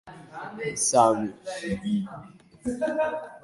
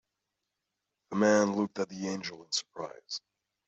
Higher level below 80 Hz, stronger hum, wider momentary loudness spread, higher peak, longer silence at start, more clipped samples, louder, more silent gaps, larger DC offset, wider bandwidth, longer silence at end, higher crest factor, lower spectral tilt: first, -58 dBFS vs -76 dBFS; neither; first, 19 LU vs 15 LU; first, -6 dBFS vs -14 dBFS; second, 0.05 s vs 1.1 s; neither; first, -26 LUFS vs -31 LUFS; neither; neither; first, 11.5 kHz vs 8.2 kHz; second, 0.05 s vs 0.5 s; about the same, 22 dB vs 20 dB; about the same, -4 dB/octave vs -4 dB/octave